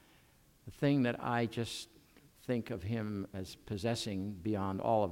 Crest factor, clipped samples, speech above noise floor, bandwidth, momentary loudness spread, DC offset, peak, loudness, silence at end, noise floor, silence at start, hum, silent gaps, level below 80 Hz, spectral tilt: 18 dB; under 0.1%; 30 dB; 16.5 kHz; 13 LU; under 0.1%; -18 dBFS; -36 LUFS; 0 s; -66 dBFS; 0.65 s; none; none; -64 dBFS; -6 dB/octave